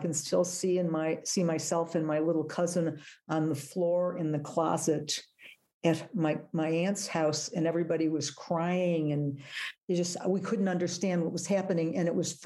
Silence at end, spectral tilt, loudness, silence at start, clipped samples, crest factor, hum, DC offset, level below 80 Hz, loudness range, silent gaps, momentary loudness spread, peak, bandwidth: 0 s; -5 dB/octave; -31 LUFS; 0 s; under 0.1%; 16 dB; none; under 0.1%; -78 dBFS; 1 LU; 5.74-5.81 s, 9.83-9.88 s; 4 LU; -14 dBFS; 12.5 kHz